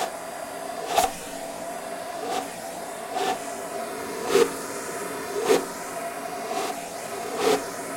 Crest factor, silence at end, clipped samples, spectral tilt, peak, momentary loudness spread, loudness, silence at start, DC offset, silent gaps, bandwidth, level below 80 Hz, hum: 22 dB; 0 s; under 0.1%; -2.5 dB/octave; -6 dBFS; 11 LU; -28 LUFS; 0 s; under 0.1%; none; 16.5 kHz; -60 dBFS; none